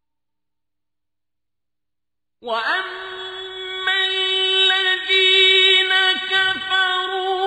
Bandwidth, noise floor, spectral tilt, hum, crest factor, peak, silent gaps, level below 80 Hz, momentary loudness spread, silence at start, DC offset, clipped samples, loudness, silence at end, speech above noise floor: 10.5 kHz; -87 dBFS; -0.5 dB/octave; 60 Hz at -75 dBFS; 18 dB; -2 dBFS; none; -64 dBFS; 18 LU; 2.45 s; under 0.1%; under 0.1%; -15 LUFS; 0 s; 70 dB